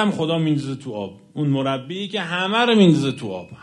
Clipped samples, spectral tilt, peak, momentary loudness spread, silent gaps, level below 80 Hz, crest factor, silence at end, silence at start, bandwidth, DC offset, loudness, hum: under 0.1%; -6.5 dB/octave; -2 dBFS; 16 LU; none; -62 dBFS; 18 dB; 0.05 s; 0 s; 11 kHz; under 0.1%; -20 LUFS; none